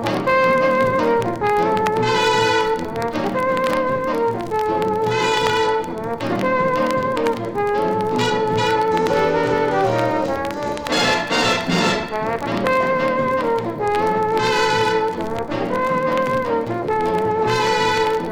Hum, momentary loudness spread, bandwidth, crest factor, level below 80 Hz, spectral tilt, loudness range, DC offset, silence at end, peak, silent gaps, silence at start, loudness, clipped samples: none; 5 LU; 17.5 kHz; 16 dB; -46 dBFS; -4.5 dB/octave; 1 LU; under 0.1%; 0 s; -2 dBFS; none; 0 s; -19 LUFS; under 0.1%